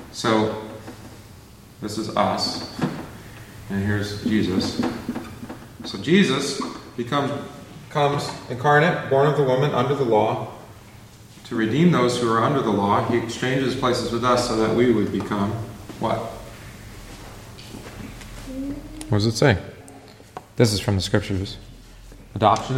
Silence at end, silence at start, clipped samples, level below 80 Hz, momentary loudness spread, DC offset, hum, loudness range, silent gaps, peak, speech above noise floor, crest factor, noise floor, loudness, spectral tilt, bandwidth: 0 s; 0 s; under 0.1%; -48 dBFS; 21 LU; under 0.1%; none; 7 LU; none; -2 dBFS; 24 dB; 20 dB; -45 dBFS; -22 LUFS; -5.5 dB/octave; 16.5 kHz